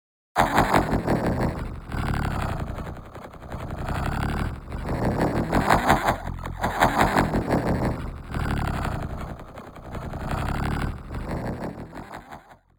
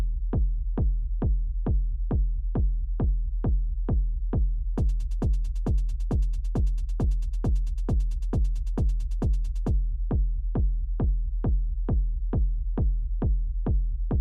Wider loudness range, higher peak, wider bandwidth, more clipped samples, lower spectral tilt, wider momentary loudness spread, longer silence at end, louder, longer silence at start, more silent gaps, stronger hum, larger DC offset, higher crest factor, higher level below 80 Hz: first, 8 LU vs 0 LU; first, -4 dBFS vs -18 dBFS; first, 19.5 kHz vs 1.8 kHz; neither; second, -6 dB/octave vs -9.5 dB/octave; first, 18 LU vs 1 LU; first, 0.25 s vs 0 s; first, -26 LUFS vs -29 LUFS; first, 0.35 s vs 0 s; neither; neither; neither; first, 22 dB vs 8 dB; second, -34 dBFS vs -26 dBFS